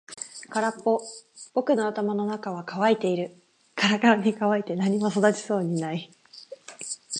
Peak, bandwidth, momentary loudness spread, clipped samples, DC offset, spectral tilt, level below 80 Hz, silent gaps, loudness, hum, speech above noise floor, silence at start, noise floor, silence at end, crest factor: -6 dBFS; 11 kHz; 17 LU; under 0.1%; under 0.1%; -5 dB/octave; -76 dBFS; none; -25 LUFS; none; 22 dB; 0.1 s; -46 dBFS; 0 s; 20 dB